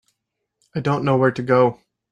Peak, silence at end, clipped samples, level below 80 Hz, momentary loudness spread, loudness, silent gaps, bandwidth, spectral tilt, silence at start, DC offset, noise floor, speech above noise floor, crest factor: -4 dBFS; 0.4 s; under 0.1%; -60 dBFS; 8 LU; -19 LUFS; none; 9.4 kHz; -8 dB/octave; 0.75 s; under 0.1%; -78 dBFS; 60 dB; 18 dB